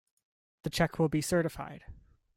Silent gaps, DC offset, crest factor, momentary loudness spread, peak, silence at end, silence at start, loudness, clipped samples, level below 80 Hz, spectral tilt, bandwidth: none; under 0.1%; 20 dB; 16 LU; -14 dBFS; 0.35 s; 0.65 s; -31 LUFS; under 0.1%; -54 dBFS; -5.5 dB/octave; 16.5 kHz